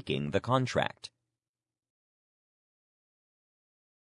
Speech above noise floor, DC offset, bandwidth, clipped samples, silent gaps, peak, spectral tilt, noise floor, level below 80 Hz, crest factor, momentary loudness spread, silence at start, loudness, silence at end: over 59 dB; under 0.1%; 11 kHz; under 0.1%; none; -10 dBFS; -6 dB/octave; under -90 dBFS; -68 dBFS; 26 dB; 19 LU; 0.05 s; -31 LUFS; 3.05 s